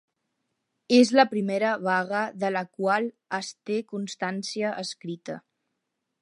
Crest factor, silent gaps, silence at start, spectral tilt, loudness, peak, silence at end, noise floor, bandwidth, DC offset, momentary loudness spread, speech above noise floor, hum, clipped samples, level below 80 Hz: 20 dB; none; 0.9 s; -4.5 dB/octave; -26 LUFS; -6 dBFS; 0.8 s; -81 dBFS; 11.5 kHz; under 0.1%; 15 LU; 55 dB; none; under 0.1%; -80 dBFS